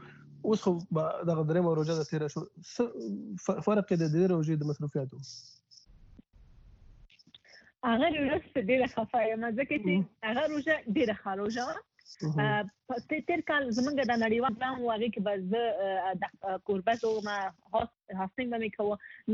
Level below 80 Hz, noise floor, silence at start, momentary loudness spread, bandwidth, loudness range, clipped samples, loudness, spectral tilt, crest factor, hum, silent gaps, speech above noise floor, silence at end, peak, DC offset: -64 dBFS; -59 dBFS; 0 s; 9 LU; 7.8 kHz; 4 LU; under 0.1%; -31 LUFS; -6.5 dB/octave; 16 dB; none; none; 28 dB; 0 s; -16 dBFS; under 0.1%